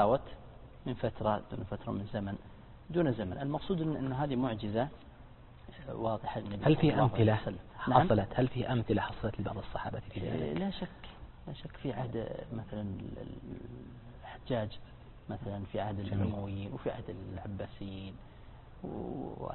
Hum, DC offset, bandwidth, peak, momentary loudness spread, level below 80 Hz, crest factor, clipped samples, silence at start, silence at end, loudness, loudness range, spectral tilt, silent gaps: none; under 0.1%; 4.3 kHz; -10 dBFS; 21 LU; -52 dBFS; 26 dB; under 0.1%; 0 s; 0 s; -35 LUFS; 11 LU; -11 dB/octave; none